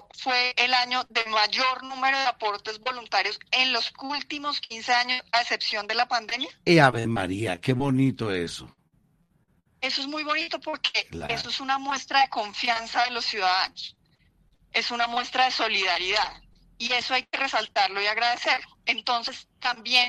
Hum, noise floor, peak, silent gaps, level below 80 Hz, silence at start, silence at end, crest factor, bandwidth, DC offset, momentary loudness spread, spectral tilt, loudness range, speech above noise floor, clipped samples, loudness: none; -66 dBFS; -2 dBFS; none; -60 dBFS; 0.15 s; 0 s; 24 dB; 13 kHz; under 0.1%; 9 LU; -3.5 dB/octave; 5 LU; 41 dB; under 0.1%; -25 LUFS